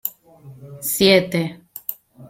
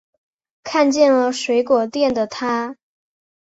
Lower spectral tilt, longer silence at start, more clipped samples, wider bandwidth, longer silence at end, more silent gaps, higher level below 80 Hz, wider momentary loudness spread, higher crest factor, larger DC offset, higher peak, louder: about the same, -4 dB/octave vs -3.5 dB/octave; second, 0.05 s vs 0.65 s; neither; first, 16.5 kHz vs 8 kHz; second, 0 s vs 0.85 s; neither; first, -56 dBFS vs -62 dBFS; first, 16 LU vs 9 LU; about the same, 20 dB vs 16 dB; neither; about the same, -2 dBFS vs -4 dBFS; about the same, -19 LUFS vs -18 LUFS